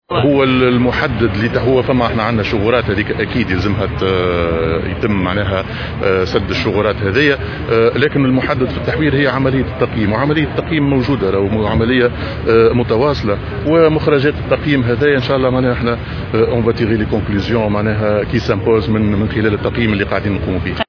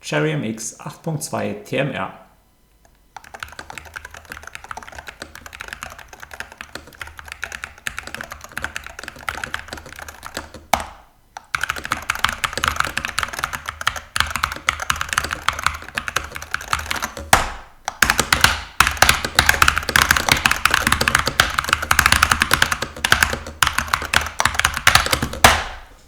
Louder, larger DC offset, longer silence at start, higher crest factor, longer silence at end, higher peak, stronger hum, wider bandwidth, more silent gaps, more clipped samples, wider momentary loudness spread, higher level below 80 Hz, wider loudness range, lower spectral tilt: first, -15 LUFS vs -18 LUFS; neither; about the same, 0.1 s vs 0.05 s; second, 14 dB vs 22 dB; about the same, 0.05 s vs 0.1 s; about the same, 0 dBFS vs 0 dBFS; neither; second, 5.4 kHz vs over 20 kHz; neither; neither; second, 5 LU vs 20 LU; first, -30 dBFS vs -36 dBFS; second, 2 LU vs 19 LU; first, -8 dB/octave vs -2 dB/octave